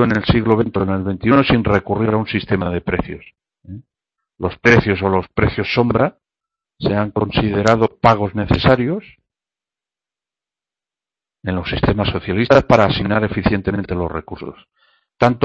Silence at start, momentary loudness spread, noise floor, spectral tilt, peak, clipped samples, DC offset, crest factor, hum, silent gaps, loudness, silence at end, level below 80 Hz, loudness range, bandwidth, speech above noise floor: 0 s; 13 LU; -90 dBFS; -7.5 dB/octave; 0 dBFS; under 0.1%; under 0.1%; 18 dB; none; none; -17 LUFS; 0.05 s; -36 dBFS; 5 LU; 7.8 kHz; 73 dB